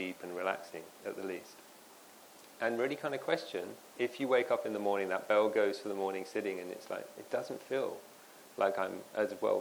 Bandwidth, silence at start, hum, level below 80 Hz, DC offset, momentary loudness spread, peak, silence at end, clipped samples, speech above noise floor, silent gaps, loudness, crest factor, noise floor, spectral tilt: over 20 kHz; 0 s; none; -86 dBFS; under 0.1%; 23 LU; -16 dBFS; 0 s; under 0.1%; 22 dB; none; -36 LUFS; 20 dB; -57 dBFS; -4.5 dB/octave